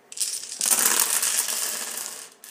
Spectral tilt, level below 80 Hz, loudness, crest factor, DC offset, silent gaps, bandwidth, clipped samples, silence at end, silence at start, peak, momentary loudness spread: 2.5 dB/octave; -82 dBFS; -22 LUFS; 26 dB; under 0.1%; none; 16.5 kHz; under 0.1%; 0 s; 0.1 s; 0 dBFS; 14 LU